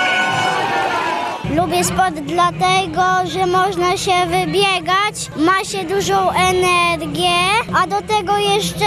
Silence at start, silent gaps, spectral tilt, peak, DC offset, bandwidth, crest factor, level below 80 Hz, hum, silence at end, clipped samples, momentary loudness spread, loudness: 0 s; none; -3.5 dB/octave; -4 dBFS; under 0.1%; 13.5 kHz; 14 dB; -44 dBFS; none; 0 s; under 0.1%; 4 LU; -16 LUFS